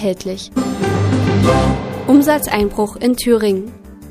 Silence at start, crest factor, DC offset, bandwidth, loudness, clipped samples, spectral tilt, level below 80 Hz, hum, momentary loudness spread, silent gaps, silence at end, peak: 0 s; 16 dB; under 0.1%; 15.5 kHz; -15 LUFS; under 0.1%; -6 dB/octave; -32 dBFS; none; 9 LU; none; 0 s; 0 dBFS